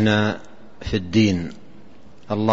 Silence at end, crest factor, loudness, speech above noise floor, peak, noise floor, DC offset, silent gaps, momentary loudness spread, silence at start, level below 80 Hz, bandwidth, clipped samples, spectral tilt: 0 s; 18 dB; -22 LUFS; 28 dB; -4 dBFS; -48 dBFS; 1%; none; 15 LU; 0 s; -46 dBFS; 7.6 kHz; under 0.1%; -6.5 dB/octave